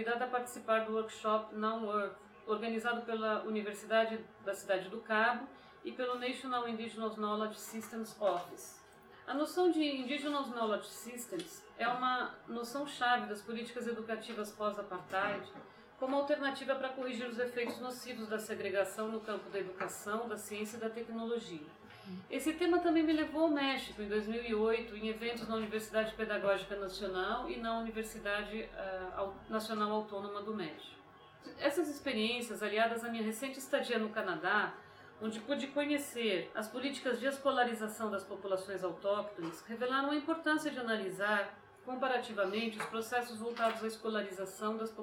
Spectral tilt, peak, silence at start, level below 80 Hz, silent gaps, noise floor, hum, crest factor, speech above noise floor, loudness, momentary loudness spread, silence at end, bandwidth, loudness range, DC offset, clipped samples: -4 dB/octave; -18 dBFS; 0 s; -70 dBFS; none; -58 dBFS; none; 18 dB; 22 dB; -37 LUFS; 10 LU; 0 s; 17 kHz; 4 LU; under 0.1%; under 0.1%